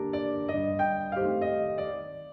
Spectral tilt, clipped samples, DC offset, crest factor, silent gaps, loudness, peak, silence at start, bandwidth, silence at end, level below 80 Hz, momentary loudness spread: -9.5 dB/octave; under 0.1%; under 0.1%; 14 dB; none; -29 LUFS; -16 dBFS; 0 s; 5 kHz; 0 s; -60 dBFS; 6 LU